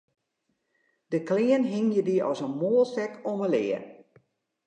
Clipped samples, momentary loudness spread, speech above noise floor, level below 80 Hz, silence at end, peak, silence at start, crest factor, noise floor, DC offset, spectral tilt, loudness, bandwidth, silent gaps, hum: under 0.1%; 8 LU; 52 dB; -82 dBFS; 0.7 s; -12 dBFS; 1.1 s; 16 dB; -78 dBFS; under 0.1%; -7 dB/octave; -27 LUFS; 9 kHz; none; none